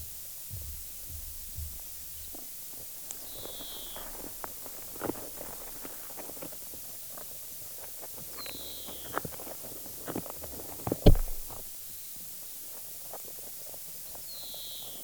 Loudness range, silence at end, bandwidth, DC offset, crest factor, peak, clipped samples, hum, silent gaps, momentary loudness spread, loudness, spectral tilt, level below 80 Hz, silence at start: 6 LU; 0 s; over 20 kHz; under 0.1%; 32 dB; -4 dBFS; under 0.1%; none; none; 3 LU; -36 LUFS; -4.5 dB/octave; -38 dBFS; 0 s